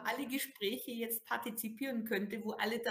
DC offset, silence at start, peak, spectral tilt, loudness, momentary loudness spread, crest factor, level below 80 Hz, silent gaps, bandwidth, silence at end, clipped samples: under 0.1%; 0 s; -20 dBFS; -3 dB/octave; -38 LUFS; 3 LU; 18 dB; -82 dBFS; none; 16 kHz; 0 s; under 0.1%